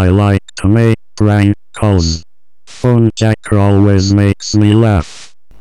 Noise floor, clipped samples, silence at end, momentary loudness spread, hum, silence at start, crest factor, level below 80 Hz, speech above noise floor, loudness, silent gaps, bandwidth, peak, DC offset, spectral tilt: -41 dBFS; under 0.1%; 0 s; 7 LU; none; 0 s; 10 dB; -30 dBFS; 31 dB; -12 LUFS; none; 11 kHz; 0 dBFS; 2%; -7 dB/octave